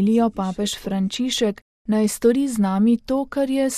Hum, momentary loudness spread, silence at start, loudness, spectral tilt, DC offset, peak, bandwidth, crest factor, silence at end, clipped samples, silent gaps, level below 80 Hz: none; 6 LU; 0 s; -21 LUFS; -5 dB/octave; under 0.1%; -6 dBFS; 15 kHz; 14 dB; 0 s; under 0.1%; 1.62-1.85 s; -50 dBFS